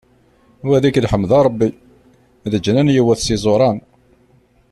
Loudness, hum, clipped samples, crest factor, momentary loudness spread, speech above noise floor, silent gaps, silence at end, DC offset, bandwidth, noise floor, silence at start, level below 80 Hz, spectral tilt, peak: -16 LUFS; none; under 0.1%; 14 dB; 9 LU; 39 dB; none; 0.9 s; under 0.1%; 13 kHz; -54 dBFS; 0.65 s; -40 dBFS; -6.5 dB/octave; -2 dBFS